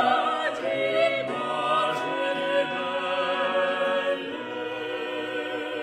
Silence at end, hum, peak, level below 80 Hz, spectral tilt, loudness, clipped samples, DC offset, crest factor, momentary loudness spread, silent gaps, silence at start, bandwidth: 0 s; none; -10 dBFS; -72 dBFS; -4 dB/octave; -26 LUFS; under 0.1%; under 0.1%; 16 dB; 7 LU; none; 0 s; 11 kHz